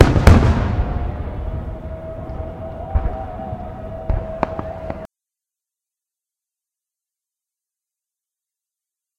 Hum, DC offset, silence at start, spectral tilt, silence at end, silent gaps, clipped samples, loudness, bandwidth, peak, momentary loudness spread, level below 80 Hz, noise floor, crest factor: none; under 0.1%; 0 s; -7.5 dB/octave; 4.15 s; none; under 0.1%; -21 LUFS; 11.5 kHz; 0 dBFS; 18 LU; -26 dBFS; -88 dBFS; 20 dB